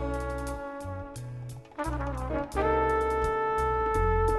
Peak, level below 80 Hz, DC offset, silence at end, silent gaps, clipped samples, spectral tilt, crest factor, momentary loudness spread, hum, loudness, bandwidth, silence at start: -14 dBFS; -36 dBFS; under 0.1%; 0 s; none; under 0.1%; -6.5 dB/octave; 14 dB; 14 LU; none; -30 LUFS; 13 kHz; 0 s